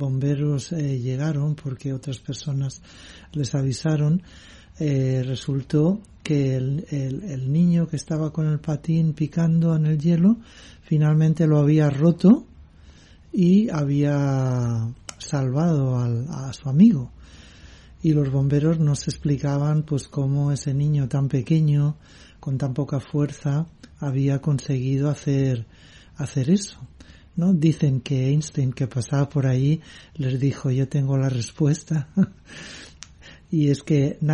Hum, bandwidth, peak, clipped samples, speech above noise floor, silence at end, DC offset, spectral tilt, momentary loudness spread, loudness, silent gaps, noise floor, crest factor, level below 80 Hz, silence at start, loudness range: none; 10.5 kHz; -4 dBFS; under 0.1%; 27 dB; 0 s; under 0.1%; -7.5 dB/octave; 11 LU; -22 LUFS; none; -48 dBFS; 18 dB; -50 dBFS; 0 s; 5 LU